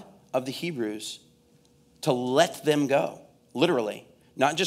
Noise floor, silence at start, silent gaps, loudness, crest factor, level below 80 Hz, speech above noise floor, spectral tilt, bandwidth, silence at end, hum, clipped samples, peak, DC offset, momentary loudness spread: -61 dBFS; 0 s; none; -27 LUFS; 22 dB; -74 dBFS; 35 dB; -4.5 dB/octave; 16 kHz; 0 s; none; under 0.1%; -6 dBFS; under 0.1%; 15 LU